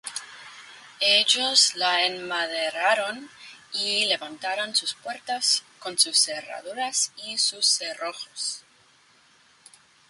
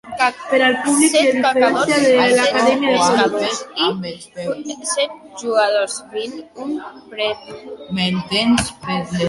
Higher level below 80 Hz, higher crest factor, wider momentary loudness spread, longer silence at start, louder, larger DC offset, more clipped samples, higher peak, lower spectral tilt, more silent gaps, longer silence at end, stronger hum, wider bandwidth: second, -80 dBFS vs -50 dBFS; first, 22 dB vs 16 dB; about the same, 17 LU vs 15 LU; about the same, 0.05 s vs 0.05 s; second, -23 LUFS vs -17 LUFS; neither; neither; about the same, -4 dBFS vs -2 dBFS; second, 1.5 dB/octave vs -3.5 dB/octave; neither; first, 1.5 s vs 0 s; neither; about the same, 11.5 kHz vs 11.5 kHz